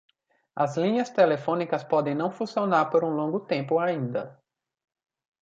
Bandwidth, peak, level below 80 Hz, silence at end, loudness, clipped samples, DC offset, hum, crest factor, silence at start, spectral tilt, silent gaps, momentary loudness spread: 7.6 kHz; -8 dBFS; -76 dBFS; 1.1 s; -26 LUFS; under 0.1%; under 0.1%; none; 18 dB; 0.55 s; -7 dB/octave; none; 7 LU